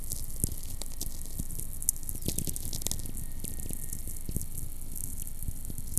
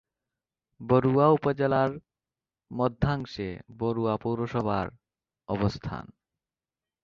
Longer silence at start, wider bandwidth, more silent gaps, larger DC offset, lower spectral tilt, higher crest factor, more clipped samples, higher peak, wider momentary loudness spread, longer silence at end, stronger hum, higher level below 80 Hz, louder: second, 0 s vs 0.8 s; first, 15 kHz vs 7.2 kHz; neither; neither; second, -3.5 dB/octave vs -8.5 dB/octave; first, 30 dB vs 20 dB; neither; first, -2 dBFS vs -8 dBFS; second, 9 LU vs 16 LU; second, 0 s vs 1 s; neither; first, -40 dBFS vs -52 dBFS; second, -36 LUFS vs -27 LUFS